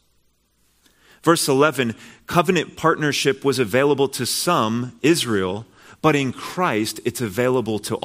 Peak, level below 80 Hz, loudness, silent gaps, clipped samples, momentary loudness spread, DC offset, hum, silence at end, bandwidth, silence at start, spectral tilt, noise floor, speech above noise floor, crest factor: 0 dBFS; -58 dBFS; -20 LUFS; none; under 0.1%; 7 LU; under 0.1%; none; 0.05 s; 16 kHz; 1.25 s; -4.5 dB/octave; -63 dBFS; 43 dB; 20 dB